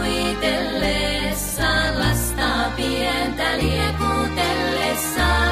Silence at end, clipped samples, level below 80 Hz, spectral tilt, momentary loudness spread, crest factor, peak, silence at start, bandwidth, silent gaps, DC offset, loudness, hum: 0 s; under 0.1%; -30 dBFS; -4 dB/octave; 3 LU; 16 dB; -6 dBFS; 0 s; 15.5 kHz; none; under 0.1%; -20 LUFS; none